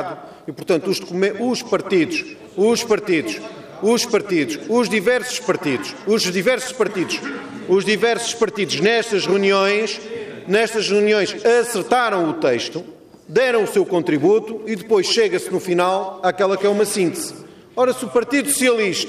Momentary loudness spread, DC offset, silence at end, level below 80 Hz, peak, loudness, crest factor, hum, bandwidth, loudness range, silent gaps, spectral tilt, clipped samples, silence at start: 10 LU; under 0.1%; 0 s; -62 dBFS; -6 dBFS; -19 LUFS; 14 dB; none; 15.5 kHz; 2 LU; none; -3.5 dB/octave; under 0.1%; 0 s